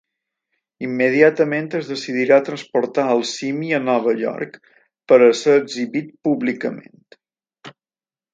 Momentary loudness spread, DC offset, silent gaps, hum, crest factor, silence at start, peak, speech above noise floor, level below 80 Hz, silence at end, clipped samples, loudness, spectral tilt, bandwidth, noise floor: 13 LU; under 0.1%; none; none; 18 dB; 0.8 s; 0 dBFS; over 72 dB; -70 dBFS; 0.65 s; under 0.1%; -18 LUFS; -5 dB/octave; 9 kHz; under -90 dBFS